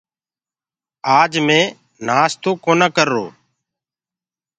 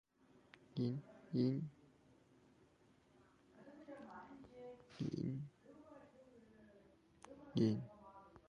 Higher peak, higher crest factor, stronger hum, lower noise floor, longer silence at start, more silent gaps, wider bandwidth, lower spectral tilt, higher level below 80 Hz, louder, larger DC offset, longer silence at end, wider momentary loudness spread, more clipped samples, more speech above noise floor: first, 0 dBFS vs -24 dBFS; second, 18 dB vs 24 dB; neither; first, under -90 dBFS vs -72 dBFS; first, 1.05 s vs 0.75 s; neither; about the same, 9.4 kHz vs 10 kHz; second, -4 dB/octave vs -8.5 dB/octave; first, -66 dBFS vs -76 dBFS; first, -16 LUFS vs -43 LUFS; neither; first, 1.3 s vs 0.1 s; second, 11 LU vs 26 LU; neither; first, over 75 dB vs 33 dB